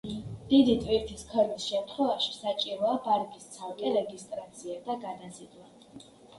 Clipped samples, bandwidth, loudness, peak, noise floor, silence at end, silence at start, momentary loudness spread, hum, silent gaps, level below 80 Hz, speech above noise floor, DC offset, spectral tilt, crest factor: under 0.1%; 11.5 kHz; -29 LUFS; -12 dBFS; -52 dBFS; 0 s; 0.05 s; 17 LU; none; none; -56 dBFS; 22 dB; under 0.1%; -5 dB/octave; 20 dB